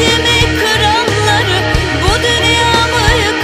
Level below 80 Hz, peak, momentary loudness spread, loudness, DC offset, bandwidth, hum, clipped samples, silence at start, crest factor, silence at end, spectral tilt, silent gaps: -24 dBFS; 0 dBFS; 3 LU; -10 LUFS; under 0.1%; 16 kHz; none; under 0.1%; 0 s; 12 dB; 0 s; -3.5 dB/octave; none